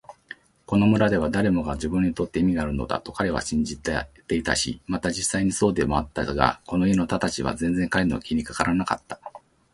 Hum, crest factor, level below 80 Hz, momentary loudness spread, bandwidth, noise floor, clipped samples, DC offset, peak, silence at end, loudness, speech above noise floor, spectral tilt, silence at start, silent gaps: none; 24 dB; -42 dBFS; 8 LU; 11.5 kHz; -46 dBFS; under 0.1%; under 0.1%; 0 dBFS; 0.35 s; -24 LUFS; 23 dB; -5 dB/octave; 0.1 s; none